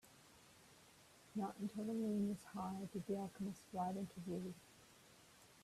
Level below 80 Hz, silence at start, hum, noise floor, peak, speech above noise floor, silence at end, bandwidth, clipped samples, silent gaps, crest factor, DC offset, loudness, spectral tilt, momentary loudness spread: -78 dBFS; 0.05 s; none; -67 dBFS; -32 dBFS; 22 dB; 0 s; 14.5 kHz; under 0.1%; none; 16 dB; under 0.1%; -46 LUFS; -7 dB/octave; 22 LU